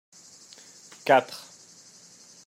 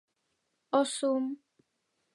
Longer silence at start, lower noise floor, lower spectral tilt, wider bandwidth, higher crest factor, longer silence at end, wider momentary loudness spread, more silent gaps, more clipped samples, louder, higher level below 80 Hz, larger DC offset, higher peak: first, 1.05 s vs 0.7 s; second, -52 dBFS vs -79 dBFS; about the same, -3.5 dB/octave vs -2.5 dB/octave; first, 16 kHz vs 11.5 kHz; about the same, 24 dB vs 20 dB; first, 1.1 s vs 0.8 s; first, 27 LU vs 10 LU; neither; neither; first, -23 LUFS vs -31 LUFS; first, -84 dBFS vs under -90 dBFS; neither; first, -6 dBFS vs -14 dBFS